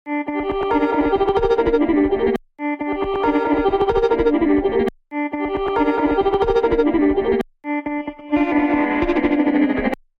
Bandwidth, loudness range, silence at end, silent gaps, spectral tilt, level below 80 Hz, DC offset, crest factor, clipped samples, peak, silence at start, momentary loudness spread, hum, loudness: 6.2 kHz; 1 LU; 0.25 s; none; -7.5 dB/octave; -36 dBFS; under 0.1%; 12 dB; under 0.1%; -6 dBFS; 0.05 s; 7 LU; none; -19 LUFS